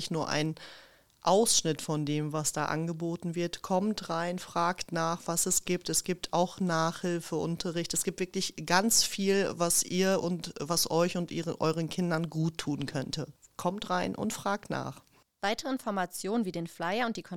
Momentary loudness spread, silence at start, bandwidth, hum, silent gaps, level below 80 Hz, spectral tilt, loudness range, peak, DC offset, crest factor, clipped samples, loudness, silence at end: 9 LU; 0 s; 18.5 kHz; none; none; -60 dBFS; -3.5 dB/octave; 6 LU; -8 dBFS; 0.2%; 24 dB; under 0.1%; -30 LUFS; 0 s